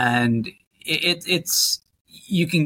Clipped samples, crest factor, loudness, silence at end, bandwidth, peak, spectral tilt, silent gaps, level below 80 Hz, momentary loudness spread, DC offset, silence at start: under 0.1%; 16 dB; -21 LUFS; 0 s; 17 kHz; -6 dBFS; -3 dB/octave; 0.67-0.71 s, 2.01-2.05 s; -60 dBFS; 9 LU; under 0.1%; 0 s